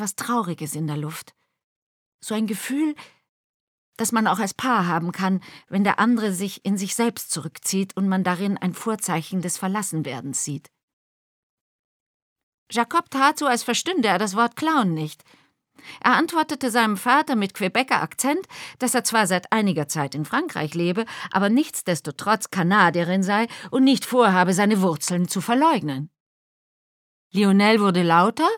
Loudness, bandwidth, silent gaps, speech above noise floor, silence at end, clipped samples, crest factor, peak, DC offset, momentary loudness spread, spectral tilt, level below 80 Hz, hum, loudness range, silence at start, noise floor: -22 LUFS; 18.5 kHz; 1.64-2.19 s, 3.29-3.93 s, 10.83-12.36 s, 12.43-12.66 s, 26.20-27.31 s; over 68 dB; 0 s; under 0.1%; 20 dB; -2 dBFS; under 0.1%; 10 LU; -4.5 dB/octave; -74 dBFS; none; 8 LU; 0 s; under -90 dBFS